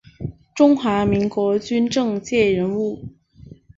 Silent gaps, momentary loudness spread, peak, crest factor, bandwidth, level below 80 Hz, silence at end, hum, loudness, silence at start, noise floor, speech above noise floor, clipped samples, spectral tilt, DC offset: none; 17 LU; -4 dBFS; 16 dB; 7.8 kHz; -48 dBFS; 0.7 s; none; -19 LUFS; 0.2 s; -44 dBFS; 26 dB; under 0.1%; -6 dB/octave; under 0.1%